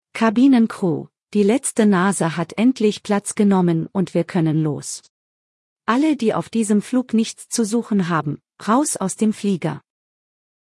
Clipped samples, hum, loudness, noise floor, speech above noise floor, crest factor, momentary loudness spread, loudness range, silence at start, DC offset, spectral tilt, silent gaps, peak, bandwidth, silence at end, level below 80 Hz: under 0.1%; none; -19 LUFS; under -90 dBFS; over 72 dB; 16 dB; 9 LU; 3 LU; 0.15 s; under 0.1%; -5.5 dB/octave; 5.09-5.76 s; -4 dBFS; 12 kHz; 0.8 s; -66 dBFS